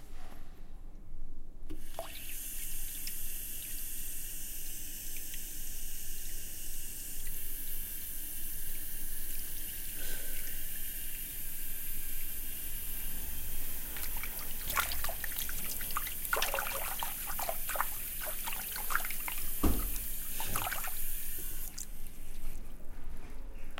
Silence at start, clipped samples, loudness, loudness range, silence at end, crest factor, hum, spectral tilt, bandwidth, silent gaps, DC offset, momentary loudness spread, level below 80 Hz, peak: 0 s; under 0.1%; -37 LUFS; 6 LU; 0 s; 22 dB; none; -2 dB/octave; 17 kHz; none; under 0.1%; 16 LU; -40 dBFS; -12 dBFS